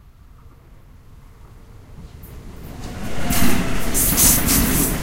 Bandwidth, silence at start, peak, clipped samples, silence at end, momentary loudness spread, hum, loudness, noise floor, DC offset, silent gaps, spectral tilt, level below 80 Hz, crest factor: 16 kHz; 1.55 s; -2 dBFS; under 0.1%; 0 s; 27 LU; none; -17 LUFS; -44 dBFS; under 0.1%; none; -3 dB/octave; -30 dBFS; 18 dB